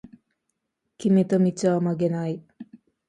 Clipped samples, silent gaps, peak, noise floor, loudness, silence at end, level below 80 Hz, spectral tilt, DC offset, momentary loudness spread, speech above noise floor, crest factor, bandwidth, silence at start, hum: under 0.1%; none; -8 dBFS; -79 dBFS; -23 LUFS; 0.35 s; -66 dBFS; -8 dB/octave; under 0.1%; 10 LU; 57 dB; 16 dB; 11 kHz; 0.05 s; none